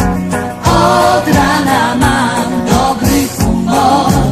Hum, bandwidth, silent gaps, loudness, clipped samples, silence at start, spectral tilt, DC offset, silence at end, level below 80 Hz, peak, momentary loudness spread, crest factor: none; 16 kHz; none; -11 LUFS; under 0.1%; 0 s; -5 dB/octave; under 0.1%; 0 s; -26 dBFS; 0 dBFS; 5 LU; 10 dB